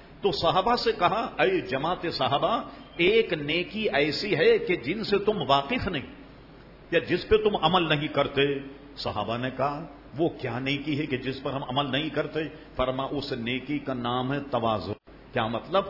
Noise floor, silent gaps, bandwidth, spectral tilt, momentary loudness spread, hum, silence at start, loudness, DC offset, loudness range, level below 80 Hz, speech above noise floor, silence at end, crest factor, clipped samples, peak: -49 dBFS; none; 5.8 kHz; -6.5 dB/octave; 9 LU; none; 0 s; -26 LUFS; under 0.1%; 5 LU; -50 dBFS; 22 dB; 0 s; 20 dB; under 0.1%; -6 dBFS